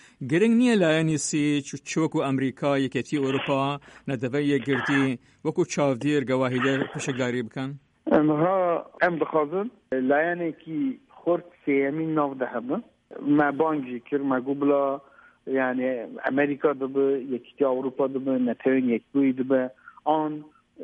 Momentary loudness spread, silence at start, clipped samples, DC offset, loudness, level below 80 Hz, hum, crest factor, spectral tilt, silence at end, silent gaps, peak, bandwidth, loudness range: 9 LU; 0.2 s; under 0.1%; under 0.1%; -25 LUFS; -68 dBFS; none; 16 dB; -6 dB/octave; 0 s; none; -8 dBFS; 11 kHz; 2 LU